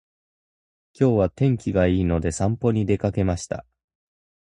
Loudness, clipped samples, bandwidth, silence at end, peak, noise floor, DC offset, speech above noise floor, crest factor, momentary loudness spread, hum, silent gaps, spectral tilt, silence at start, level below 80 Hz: -22 LUFS; under 0.1%; 11 kHz; 1 s; -6 dBFS; under -90 dBFS; under 0.1%; over 69 dB; 18 dB; 6 LU; none; none; -7.5 dB/octave; 1 s; -38 dBFS